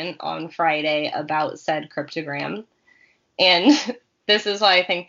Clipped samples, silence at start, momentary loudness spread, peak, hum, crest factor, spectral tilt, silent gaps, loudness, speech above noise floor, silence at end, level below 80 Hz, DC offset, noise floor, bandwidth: under 0.1%; 0 s; 15 LU; -2 dBFS; none; 18 dB; -1 dB/octave; none; -20 LUFS; 37 dB; 0.05 s; -72 dBFS; under 0.1%; -58 dBFS; 7.4 kHz